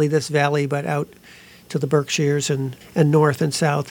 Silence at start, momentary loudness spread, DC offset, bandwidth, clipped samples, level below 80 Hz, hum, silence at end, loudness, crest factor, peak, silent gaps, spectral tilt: 0 s; 9 LU; under 0.1%; 17.5 kHz; under 0.1%; -60 dBFS; none; 0 s; -20 LUFS; 18 dB; -2 dBFS; none; -5.5 dB/octave